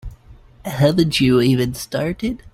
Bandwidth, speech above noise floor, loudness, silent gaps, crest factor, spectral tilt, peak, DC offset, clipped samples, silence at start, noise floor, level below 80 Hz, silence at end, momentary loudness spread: 16 kHz; 28 dB; -18 LUFS; none; 16 dB; -6 dB/octave; -4 dBFS; under 0.1%; under 0.1%; 0.05 s; -45 dBFS; -40 dBFS; 0.05 s; 11 LU